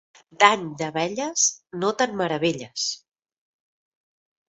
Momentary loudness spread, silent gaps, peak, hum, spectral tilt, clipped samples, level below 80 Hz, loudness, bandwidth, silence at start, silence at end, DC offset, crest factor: 9 LU; none; 0 dBFS; none; -2 dB/octave; under 0.1%; -68 dBFS; -23 LUFS; 8.2 kHz; 0.4 s; 1.5 s; under 0.1%; 26 dB